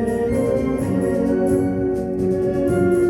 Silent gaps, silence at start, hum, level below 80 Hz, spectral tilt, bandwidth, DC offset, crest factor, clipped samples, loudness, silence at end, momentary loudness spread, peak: none; 0 s; none; -38 dBFS; -8.5 dB/octave; 16.5 kHz; under 0.1%; 10 dB; under 0.1%; -20 LUFS; 0 s; 3 LU; -8 dBFS